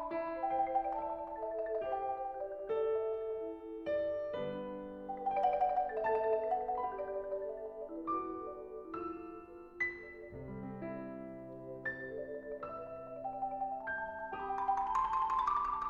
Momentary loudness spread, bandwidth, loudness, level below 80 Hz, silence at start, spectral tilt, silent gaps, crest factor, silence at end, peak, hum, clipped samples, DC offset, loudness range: 13 LU; 7.2 kHz; -38 LUFS; -64 dBFS; 0 s; -7 dB/octave; none; 16 dB; 0 s; -22 dBFS; none; under 0.1%; under 0.1%; 7 LU